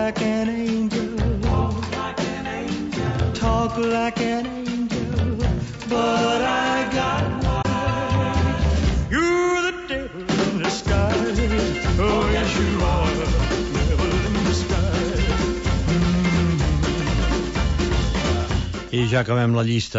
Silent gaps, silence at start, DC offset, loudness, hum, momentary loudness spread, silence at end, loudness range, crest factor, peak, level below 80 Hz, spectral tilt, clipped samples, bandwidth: none; 0 s; under 0.1%; -22 LUFS; none; 6 LU; 0 s; 2 LU; 14 dB; -8 dBFS; -28 dBFS; -6 dB/octave; under 0.1%; 8 kHz